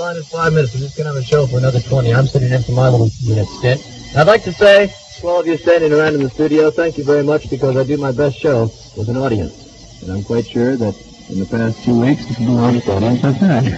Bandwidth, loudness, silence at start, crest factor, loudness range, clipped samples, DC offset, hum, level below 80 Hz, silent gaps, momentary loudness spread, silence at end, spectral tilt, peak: 8.2 kHz; -15 LUFS; 0 s; 14 dB; 6 LU; under 0.1%; under 0.1%; none; -40 dBFS; none; 10 LU; 0 s; -7 dB/octave; 0 dBFS